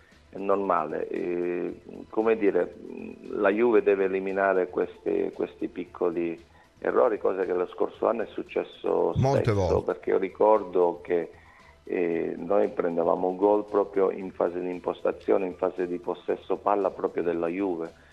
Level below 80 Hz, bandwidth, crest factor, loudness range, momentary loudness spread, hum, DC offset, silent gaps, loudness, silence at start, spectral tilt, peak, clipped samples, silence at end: -56 dBFS; 7.6 kHz; 20 dB; 3 LU; 10 LU; none; under 0.1%; none; -27 LUFS; 0.35 s; -8 dB/octave; -8 dBFS; under 0.1%; 0.2 s